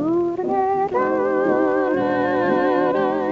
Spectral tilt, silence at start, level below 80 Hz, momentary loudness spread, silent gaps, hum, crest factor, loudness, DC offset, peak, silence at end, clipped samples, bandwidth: -8 dB/octave; 0 s; -54 dBFS; 2 LU; none; none; 14 dB; -20 LUFS; under 0.1%; -6 dBFS; 0 s; under 0.1%; 7.2 kHz